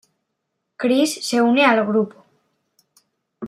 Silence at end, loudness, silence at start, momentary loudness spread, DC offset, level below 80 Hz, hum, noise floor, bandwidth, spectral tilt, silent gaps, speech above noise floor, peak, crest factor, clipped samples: 0 s; -18 LUFS; 0.8 s; 9 LU; under 0.1%; -74 dBFS; none; -76 dBFS; 14.5 kHz; -4 dB/octave; none; 59 dB; -2 dBFS; 18 dB; under 0.1%